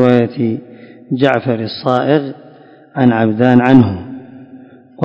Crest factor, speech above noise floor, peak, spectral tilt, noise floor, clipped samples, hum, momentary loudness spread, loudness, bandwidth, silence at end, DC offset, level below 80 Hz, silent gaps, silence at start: 14 dB; 29 dB; 0 dBFS; -9 dB/octave; -41 dBFS; 0.9%; none; 17 LU; -13 LUFS; 5.6 kHz; 0 s; under 0.1%; -46 dBFS; none; 0 s